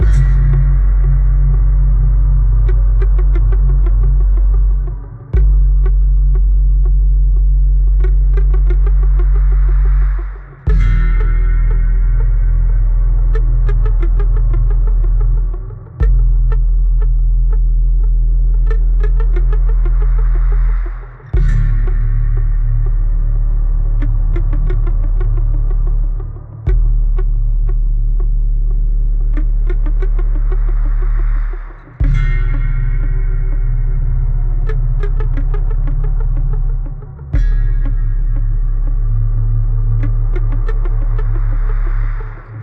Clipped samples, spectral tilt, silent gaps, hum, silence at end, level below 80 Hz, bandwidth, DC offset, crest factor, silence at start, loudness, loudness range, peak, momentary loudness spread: under 0.1%; -9.5 dB/octave; none; none; 0 s; -12 dBFS; 2.4 kHz; under 0.1%; 8 dB; 0 s; -17 LUFS; 5 LU; -2 dBFS; 6 LU